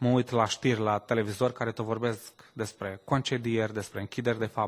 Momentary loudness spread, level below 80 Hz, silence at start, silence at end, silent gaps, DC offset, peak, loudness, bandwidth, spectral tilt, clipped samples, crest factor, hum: 11 LU; -60 dBFS; 0 s; 0 s; none; under 0.1%; -10 dBFS; -30 LUFS; 16 kHz; -5.5 dB/octave; under 0.1%; 20 dB; none